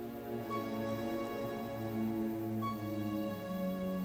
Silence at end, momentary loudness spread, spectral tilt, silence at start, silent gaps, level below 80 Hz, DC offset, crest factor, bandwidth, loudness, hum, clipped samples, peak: 0 s; 3 LU; -7 dB/octave; 0 s; none; -64 dBFS; under 0.1%; 12 dB; 20 kHz; -38 LUFS; none; under 0.1%; -26 dBFS